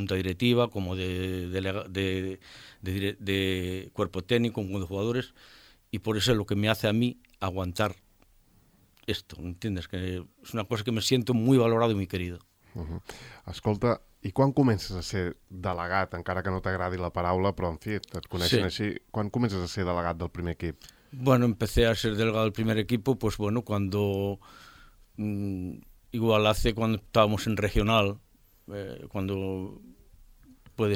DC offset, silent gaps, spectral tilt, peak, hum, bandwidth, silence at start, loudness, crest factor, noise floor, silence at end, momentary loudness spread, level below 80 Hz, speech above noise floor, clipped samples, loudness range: under 0.1%; none; -6 dB/octave; -8 dBFS; none; 17 kHz; 0 s; -29 LUFS; 20 dB; -62 dBFS; 0 s; 15 LU; -46 dBFS; 34 dB; under 0.1%; 5 LU